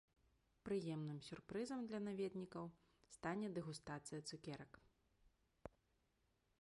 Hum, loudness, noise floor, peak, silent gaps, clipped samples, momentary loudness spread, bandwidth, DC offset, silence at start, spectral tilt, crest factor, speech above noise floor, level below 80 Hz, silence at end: none; -49 LUFS; -84 dBFS; -32 dBFS; none; under 0.1%; 17 LU; 11.5 kHz; under 0.1%; 0.65 s; -6 dB/octave; 18 dB; 35 dB; -78 dBFS; 0.9 s